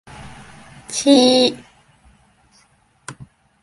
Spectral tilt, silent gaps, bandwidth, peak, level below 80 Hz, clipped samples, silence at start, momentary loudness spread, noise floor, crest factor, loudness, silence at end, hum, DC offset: -3 dB/octave; none; 11.5 kHz; 0 dBFS; -54 dBFS; under 0.1%; 0.2 s; 27 LU; -57 dBFS; 20 dB; -15 LUFS; 0.5 s; none; under 0.1%